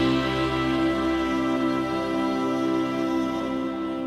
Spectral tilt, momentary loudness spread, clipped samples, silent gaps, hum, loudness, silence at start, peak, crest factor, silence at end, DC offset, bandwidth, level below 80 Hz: -6 dB/octave; 4 LU; under 0.1%; none; none; -25 LUFS; 0 s; -12 dBFS; 12 dB; 0 s; under 0.1%; 12.5 kHz; -46 dBFS